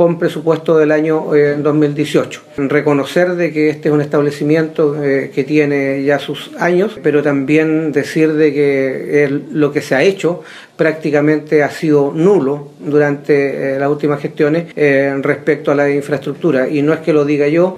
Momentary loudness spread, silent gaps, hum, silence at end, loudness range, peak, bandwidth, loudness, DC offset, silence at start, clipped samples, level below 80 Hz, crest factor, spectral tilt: 5 LU; none; none; 0 s; 1 LU; 0 dBFS; 13.5 kHz; -14 LUFS; under 0.1%; 0 s; under 0.1%; -60 dBFS; 12 dB; -7 dB/octave